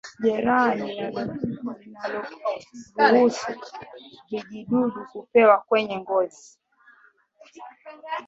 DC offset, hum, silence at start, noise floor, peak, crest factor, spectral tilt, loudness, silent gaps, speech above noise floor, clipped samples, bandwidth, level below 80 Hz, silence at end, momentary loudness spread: under 0.1%; none; 0.05 s; -58 dBFS; -4 dBFS; 20 dB; -5.5 dB/octave; -23 LUFS; none; 34 dB; under 0.1%; 8 kHz; -66 dBFS; 0.05 s; 21 LU